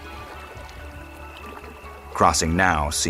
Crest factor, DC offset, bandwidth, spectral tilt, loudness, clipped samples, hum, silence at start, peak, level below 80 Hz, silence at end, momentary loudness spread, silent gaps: 22 dB; under 0.1%; 16 kHz; -3.5 dB/octave; -20 LUFS; under 0.1%; none; 0 s; -2 dBFS; -40 dBFS; 0 s; 20 LU; none